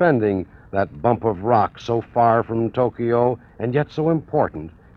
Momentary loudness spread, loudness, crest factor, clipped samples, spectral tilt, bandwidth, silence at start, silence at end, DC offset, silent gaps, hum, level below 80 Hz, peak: 7 LU; -21 LUFS; 18 dB; under 0.1%; -9 dB/octave; 6.8 kHz; 0 s; 0.25 s; under 0.1%; none; none; -50 dBFS; -2 dBFS